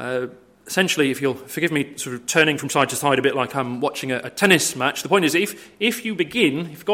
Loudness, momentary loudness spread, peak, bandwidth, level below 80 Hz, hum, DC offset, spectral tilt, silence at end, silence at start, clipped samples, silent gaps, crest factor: -20 LUFS; 10 LU; 0 dBFS; 16.5 kHz; -64 dBFS; none; under 0.1%; -3.5 dB/octave; 0 s; 0 s; under 0.1%; none; 22 dB